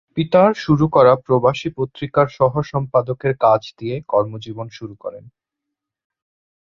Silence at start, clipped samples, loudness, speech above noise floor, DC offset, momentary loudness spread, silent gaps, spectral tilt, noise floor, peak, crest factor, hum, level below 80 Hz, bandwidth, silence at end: 0.15 s; under 0.1%; -17 LUFS; 65 dB; under 0.1%; 18 LU; none; -8 dB/octave; -82 dBFS; -2 dBFS; 16 dB; none; -50 dBFS; 7.2 kHz; 1.45 s